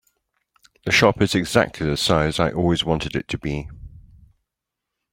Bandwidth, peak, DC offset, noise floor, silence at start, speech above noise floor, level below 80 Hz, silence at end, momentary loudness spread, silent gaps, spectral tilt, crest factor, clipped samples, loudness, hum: 16.5 kHz; -2 dBFS; under 0.1%; -83 dBFS; 0.85 s; 63 dB; -42 dBFS; 1.15 s; 12 LU; none; -5 dB/octave; 20 dB; under 0.1%; -20 LUFS; none